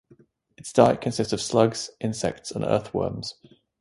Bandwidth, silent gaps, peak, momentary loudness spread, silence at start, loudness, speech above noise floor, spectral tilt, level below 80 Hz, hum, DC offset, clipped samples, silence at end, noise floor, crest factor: 11.5 kHz; none; -2 dBFS; 11 LU; 0.65 s; -24 LUFS; 34 dB; -5 dB/octave; -54 dBFS; none; under 0.1%; under 0.1%; 0.5 s; -58 dBFS; 24 dB